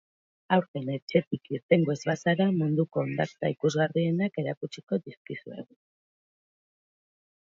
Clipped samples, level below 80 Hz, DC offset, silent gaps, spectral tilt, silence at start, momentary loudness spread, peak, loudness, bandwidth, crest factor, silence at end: under 0.1%; -72 dBFS; under 0.1%; 0.68-0.74 s, 1.02-1.07 s, 1.27-1.31 s, 1.63-1.69 s, 4.57-4.61 s, 4.83-4.87 s, 5.17-5.25 s; -7 dB/octave; 0.5 s; 14 LU; -8 dBFS; -28 LUFS; 7.6 kHz; 20 dB; 1.9 s